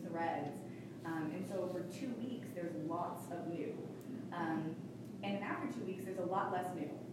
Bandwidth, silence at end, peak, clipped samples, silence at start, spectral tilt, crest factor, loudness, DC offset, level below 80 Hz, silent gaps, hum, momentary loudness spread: 16 kHz; 0 s; -26 dBFS; under 0.1%; 0 s; -6.5 dB/octave; 16 dB; -42 LUFS; under 0.1%; -80 dBFS; none; none; 8 LU